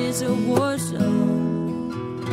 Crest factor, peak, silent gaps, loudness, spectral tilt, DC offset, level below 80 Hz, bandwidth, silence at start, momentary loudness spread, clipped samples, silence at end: 16 dB; -6 dBFS; none; -23 LUFS; -6 dB/octave; under 0.1%; -56 dBFS; 16 kHz; 0 s; 8 LU; under 0.1%; 0 s